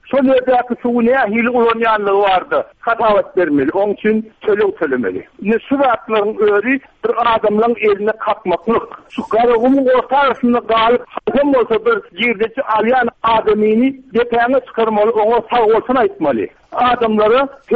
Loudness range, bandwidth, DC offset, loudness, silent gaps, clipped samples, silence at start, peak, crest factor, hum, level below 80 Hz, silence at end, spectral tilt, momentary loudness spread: 2 LU; 4.8 kHz; under 0.1%; -14 LUFS; none; under 0.1%; 0.05 s; -4 dBFS; 10 dB; none; -48 dBFS; 0 s; -7.5 dB/octave; 6 LU